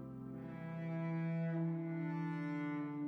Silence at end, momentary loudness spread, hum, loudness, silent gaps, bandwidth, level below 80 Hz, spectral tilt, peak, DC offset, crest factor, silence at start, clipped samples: 0 s; 9 LU; none; -41 LUFS; none; 4.6 kHz; -76 dBFS; -10 dB/octave; -30 dBFS; under 0.1%; 10 dB; 0 s; under 0.1%